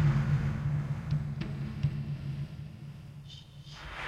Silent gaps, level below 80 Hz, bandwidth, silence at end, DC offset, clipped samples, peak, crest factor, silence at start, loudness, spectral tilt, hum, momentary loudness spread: none; -46 dBFS; 7.4 kHz; 0 s; under 0.1%; under 0.1%; -18 dBFS; 16 dB; 0 s; -34 LUFS; -8 dB/octave; none; 17 LU